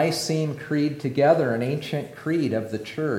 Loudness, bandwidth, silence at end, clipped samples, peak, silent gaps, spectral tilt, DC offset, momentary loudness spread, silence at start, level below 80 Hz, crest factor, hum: -24 LUFS; 16.5 kHz; 0 s; under 0.1%; -6 dBFS; none; -6 dB/octave; under 0.1%; 9 LU; 0 s; -66 dBFS; 18 dB; none